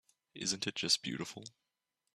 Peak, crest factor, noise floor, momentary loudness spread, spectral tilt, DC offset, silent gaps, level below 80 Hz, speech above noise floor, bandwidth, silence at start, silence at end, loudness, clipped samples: -16 dBFS; 24 dB; -87 dBFS; 17 LU; -2 dB/octave; under 0.1%; none; -76 dBFS; 49 dB; 13.5 kHz; 0.35 s; 0.65 s; -35 LUFS; under 0.1%